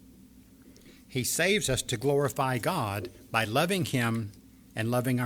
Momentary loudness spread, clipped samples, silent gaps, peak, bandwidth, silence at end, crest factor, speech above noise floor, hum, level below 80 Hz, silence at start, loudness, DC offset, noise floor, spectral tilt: 10 LU; under 0.1%; none; -10 dBFS; over 20 kHz; 0 s; 20 dB; 26 dB; none; -56 dBFS; 0.35 s; -28 LUFS; under 0.1%; -54 dBFS; -4.5 dB/octave